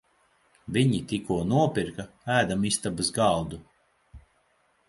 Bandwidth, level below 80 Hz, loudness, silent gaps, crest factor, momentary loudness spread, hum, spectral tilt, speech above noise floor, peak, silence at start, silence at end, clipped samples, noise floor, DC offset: 11.5 kHz; -52 dBFS; -26 LUFS; none; 20 dB; 13 LU; none; -5 dB/octave; 42 dB; -8 dBFS; 0.65 s; 0.7 s; under 0.1%; -68 dBFS; under 0.1%